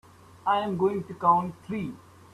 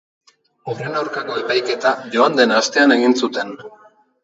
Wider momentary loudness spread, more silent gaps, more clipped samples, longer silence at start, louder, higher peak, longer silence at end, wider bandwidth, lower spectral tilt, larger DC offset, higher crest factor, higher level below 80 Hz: second, 11 LU vs 15 LU; neither; neither; second, 0.45 s vs 0.65 s; second, -27 LUFS vs -17 LUFS; second, -8 dBFS vs 0 dBFS; second, 0.35 s vs 0.55 s; first, 13 kHz vs 8 kHz; first, -7.5 dB/octave vs -3.5 dB/octave; neither; about the same, 20 dB vs 18 dB; first, -64 dBFS vs -72 dBFS